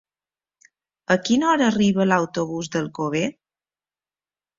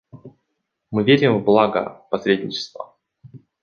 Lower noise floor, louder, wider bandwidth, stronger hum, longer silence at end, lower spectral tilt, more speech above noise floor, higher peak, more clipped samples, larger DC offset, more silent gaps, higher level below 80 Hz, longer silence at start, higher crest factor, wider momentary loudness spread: first, under -90 dBFS vs -76 dBFS; about the same, -21 LUFS vs -19 LUFS; first, 7.6 kHz vs 6.8 kHz; first, 50 Hz at -60 dBFS vs none; first, 1.25 s vs 0.25 s; second, -5 dB/octave vs -6.5 dB/octave; first, over 70 dB vs 57 dB; about the same, -4 dBFS vs -2 dBFS; neither; neither; neither; about the same, -60 dBFS vs -60 dBFS; first, 1.1 s vs 0.15 s; about the same, 20 dB vs 20 dB; second, 9 LU vs 16 LU